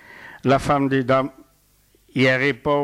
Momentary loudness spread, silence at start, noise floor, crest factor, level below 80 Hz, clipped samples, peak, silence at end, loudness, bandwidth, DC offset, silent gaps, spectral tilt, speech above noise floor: 13 LU; 0.15 s; -59 dBFS; 14 dB; -48 dBFS; under 0.1%; -8 dBFS; 0 s; -20 LUFS; 13.5 kHz; under 0.1%; none; -6.5 dB/octave; 40 dB